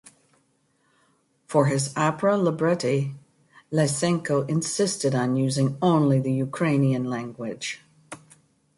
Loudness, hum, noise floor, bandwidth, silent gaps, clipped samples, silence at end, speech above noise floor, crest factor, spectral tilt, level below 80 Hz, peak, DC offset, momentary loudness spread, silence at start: -24 LUFS; none; -67 dBFS; 11.5 kHz; none; under 0.1%; 0.6 s; 44 dB; 18 dB; -5.5 dB/octave; -66 dBFS; -8 dBFS; under 0.1%; 12 LU; 1.5 s